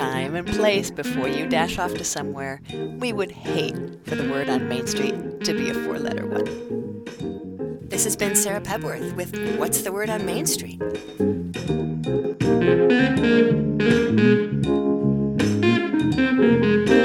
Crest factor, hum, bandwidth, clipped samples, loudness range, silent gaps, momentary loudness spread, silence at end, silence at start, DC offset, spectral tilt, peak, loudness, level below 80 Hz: 18 dB; none; 19 kHz; under 0.1%; 7 LU; none; 12 LU; 0 s; 0 s; under 0.1%; -5 dB/octave; -4 dBFS; -22 LUFS; -48 dBFS